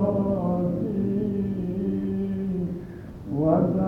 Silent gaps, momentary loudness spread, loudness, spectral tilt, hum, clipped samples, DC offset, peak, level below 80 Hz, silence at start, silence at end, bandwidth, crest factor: none; 10 LU; -26 LUFS; -11.5 dB/octave; none; under 0.1%; under 0.1%; -6 dBFS; -46 dBFS; 0 s; 0 s; 3.6 kHz; 18 dB